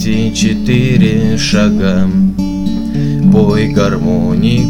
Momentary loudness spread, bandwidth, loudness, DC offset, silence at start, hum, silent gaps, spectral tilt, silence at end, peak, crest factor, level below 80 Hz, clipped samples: 6 LU; 12 kHz; -12 LUFS; 5%; 0 s; none; none; -6.5 dB/octave; 0 s; 0 dBFS; 10 dB; -28 dBFS; under 0.1%